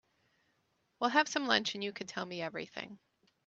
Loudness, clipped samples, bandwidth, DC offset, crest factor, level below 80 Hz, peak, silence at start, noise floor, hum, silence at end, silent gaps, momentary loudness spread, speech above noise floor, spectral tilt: -34 LUFS; under 0.1%; 8.2 kHz; under 0.1%; 26 dB; -78 dBFS; -10 dBFS; 1 s; -77 dBFS; none; 0.5 s; none; 14 LU; 43 dB; -2.5 dB/octave